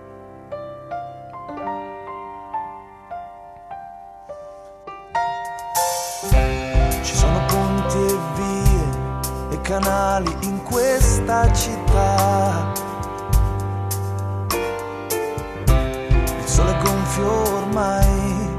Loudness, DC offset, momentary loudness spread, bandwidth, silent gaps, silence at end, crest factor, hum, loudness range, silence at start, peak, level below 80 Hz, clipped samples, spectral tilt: -21 LUFS; under 0.1%; 18 LU; 14 kHz; none; 0 s; 18 dB; none; 13 LU; 0 s; -2 dBFS; -24 dBFS; under 0.1%; -5 dB/octave